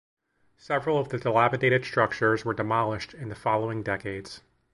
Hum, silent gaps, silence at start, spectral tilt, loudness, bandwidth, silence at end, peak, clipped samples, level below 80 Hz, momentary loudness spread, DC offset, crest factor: none; none; 0.7 s; -6.5 dB/octave; -26 LUFS; 11.5 kHz; 0.35 s; -6 dBFS; under 0.1%; -58 dBFS; 13 LU; under 0.1%; 22 dB